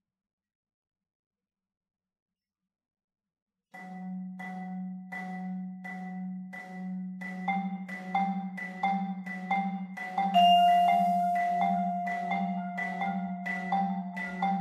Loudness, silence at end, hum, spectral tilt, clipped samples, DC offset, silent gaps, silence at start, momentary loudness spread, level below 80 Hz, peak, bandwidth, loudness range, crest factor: -30 LUFS; 0 s; none; -6.5 dB/octave; under 0.1%; under 0.1%; none; 3.75 s; 16 LU; -80 dBFS; -12 dBFS; 15 kHz; 16 LU; 18 dB